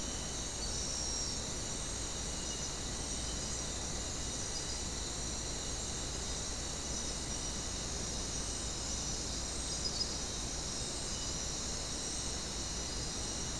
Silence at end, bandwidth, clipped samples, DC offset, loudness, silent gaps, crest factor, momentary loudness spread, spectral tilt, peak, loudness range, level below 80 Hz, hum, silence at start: 0 s; 12 kHz; under 0.1%; 0.2%; -37 LUFS; none; 16 dB; 2 LU; -2 dB/octave; -24 dBFS; 1 LU; -46 dBFS; none; 0 s